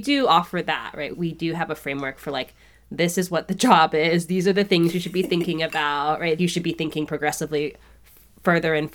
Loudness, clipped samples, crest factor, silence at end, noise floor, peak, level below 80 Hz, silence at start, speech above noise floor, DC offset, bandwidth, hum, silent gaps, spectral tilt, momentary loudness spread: -22 LUFS; under 0.1%; 20 dB; 0.05 s; -51 dBFS; -2 dBFS; -54 dBFS; 0 s; 29 dB; under 0.1%; 19.5 kHz; none; none; -5 dB/octave; 10 LU